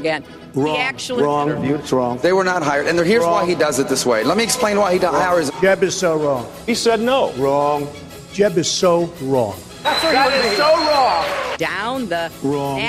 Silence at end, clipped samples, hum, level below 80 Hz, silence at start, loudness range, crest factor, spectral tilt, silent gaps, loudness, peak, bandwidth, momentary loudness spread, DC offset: 0 s; under 0.1%; none; -50 dBFS; 0 s; 2 LU; 14 dB; -4 dB/octave; none; -17 LUFS; -4 dBFS; 16 kHz; 8 LU; under 0.1%